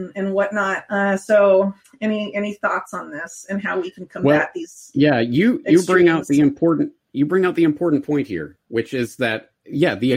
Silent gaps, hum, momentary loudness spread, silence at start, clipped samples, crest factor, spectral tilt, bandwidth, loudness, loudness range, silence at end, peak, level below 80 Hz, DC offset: none; none; 12 LU; 0 s; under 0.1%; 16 dB; -6 dB/octave; 15.5 kHz; -19 LUFS; 4 LU; 0 s; -2 dBFS; -60 dBFS; under 0.1%